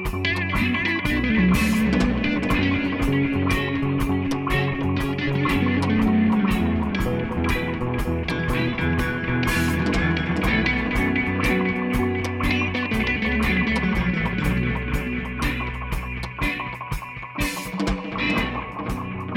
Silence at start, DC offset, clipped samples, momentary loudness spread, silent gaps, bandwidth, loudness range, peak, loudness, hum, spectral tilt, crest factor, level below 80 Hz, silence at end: 0 s; under 0.1%; under 0.1%; 7 LU; none; 17.5 kHz; 5 LU; -6 dBFS; -23 LUFS; none; -6 dB/octave; 16 dB; -32 dBFS; 0 s